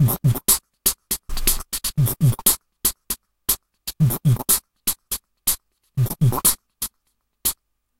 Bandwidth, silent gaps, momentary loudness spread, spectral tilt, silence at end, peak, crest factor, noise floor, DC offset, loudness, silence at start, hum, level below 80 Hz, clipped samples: 17 kHz; none; 12 LU; -3.5 dB/octave; 0.45 s; 0 dBFS; 22 dB; -71 dBFS; under 0.1%; -21 LUFS; 0 s; none; -36 dBFS; under 0.1%